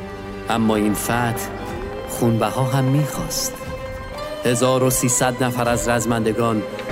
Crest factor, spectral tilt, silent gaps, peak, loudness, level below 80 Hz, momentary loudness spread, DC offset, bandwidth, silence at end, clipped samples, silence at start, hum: 16 dB; -4.5 dB/octave; none; -4 dBFS; -20 LUFS; -40 dBFS; 13 LU; under 0.1%; 16.5 kHz; 0 s; under 0.1%; 0 s; none